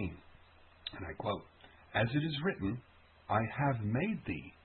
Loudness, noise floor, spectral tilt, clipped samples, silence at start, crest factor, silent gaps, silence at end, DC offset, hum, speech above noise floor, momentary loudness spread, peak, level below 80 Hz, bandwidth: -36 LUFS; -61 dBFS; -5 dB/octave; under 0.1%; 0 s; 18 dB; none; 0.15 s; under 0.1%; none; 26 dB; 13 LU; -18 dBFS; -60 dBFS; 4.3 kHz